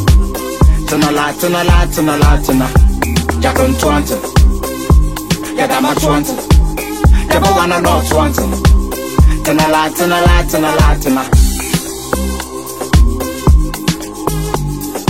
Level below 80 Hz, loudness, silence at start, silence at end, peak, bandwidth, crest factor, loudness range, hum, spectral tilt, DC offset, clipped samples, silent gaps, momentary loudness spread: -14 dBFS; -13 LUFS; 0 s; 0 s; 0 dBFS; 16.5 kHz; 12 dB; 2 LU; none; -5.5 dB/octave; under 0.1%; under 0.1%; none; 7 LU